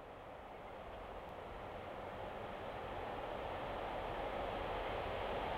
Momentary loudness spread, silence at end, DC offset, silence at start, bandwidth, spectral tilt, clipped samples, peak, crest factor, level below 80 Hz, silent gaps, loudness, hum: 9 LU; 0 s; under 0.1%; 0 s; 16 kHz; -6 dB/octave; under 0.1%; -30 dBFS; 16 dB; -56 dBFS; none; -45 LUFS; none